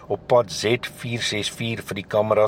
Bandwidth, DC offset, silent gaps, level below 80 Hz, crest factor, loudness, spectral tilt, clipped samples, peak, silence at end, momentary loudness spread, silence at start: 16.5 kHz; under 0.1%; none; -56 dBFS; 16 dB; -23 LUFS; -4.5 dB/octave; under 0.1%; -6 dBFS; 0 s; 8 LU; 0 s